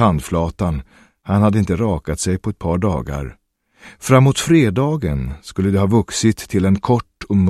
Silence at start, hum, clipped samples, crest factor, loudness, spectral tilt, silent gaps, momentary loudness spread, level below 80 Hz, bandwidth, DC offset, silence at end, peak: 0 s; none; under 0.1%; 16 dB; -18 LUFS; -6.5 dB/octave; none; 12 LU; -34 dBFS; 14 kHz; under 0.1%; 0 s; 0 dBFS